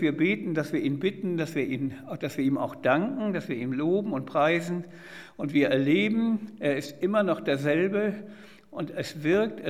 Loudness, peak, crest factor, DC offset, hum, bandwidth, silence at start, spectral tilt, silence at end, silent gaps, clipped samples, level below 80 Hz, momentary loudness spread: -27 LUFS; -8 dBFS; 18 dB; 0.1%; none; 14.5 kHz; 0 s; -6.5 dB/octave; 0 s; none; under 0.1%; -70 dBFS; 11 LU